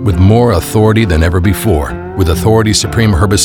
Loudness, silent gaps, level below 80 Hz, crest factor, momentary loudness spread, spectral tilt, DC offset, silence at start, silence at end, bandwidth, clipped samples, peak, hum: -10 LUFS; none; -22 dBFS; 10 dB; 5 LU; -5.5 dB/octave; under 0.1%; 0 s; 0 s; 18.5 kHz; under 0.1%; 0 dBFS; none